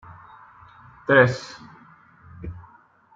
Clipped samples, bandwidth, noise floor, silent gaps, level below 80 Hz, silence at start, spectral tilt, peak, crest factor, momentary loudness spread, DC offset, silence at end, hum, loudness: under 0.1%; 7.8 kHz; -54 dBFS; none; -54 dBFS; 1.1 s; -6.5 dB/octave; -2 dBFS; 24 dB; 26 LU; under 0.1%; 0.55 s; none; -20 LUFS